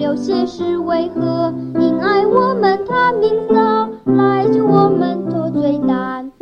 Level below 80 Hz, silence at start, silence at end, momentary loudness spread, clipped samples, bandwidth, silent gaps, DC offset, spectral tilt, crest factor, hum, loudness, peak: -54 dBFS; 0 s; 0.1 s; 6 LU; under 0.1%; 7 kHz; none; under 0.1%; -8 dB/octave; 14 dB; none; -15 LUFS; 0 dBFS